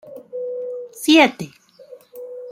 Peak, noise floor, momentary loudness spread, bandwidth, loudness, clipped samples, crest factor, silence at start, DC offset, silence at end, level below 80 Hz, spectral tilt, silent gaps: -2 dBFS; -45 dBFS; 22 LU; 15.5 kHz; -17 LUFS; under 0.1%; 20 dB; 0.05 s; under 0.1%; 0 s; -68 dBFS; -3.5 dB/octave; none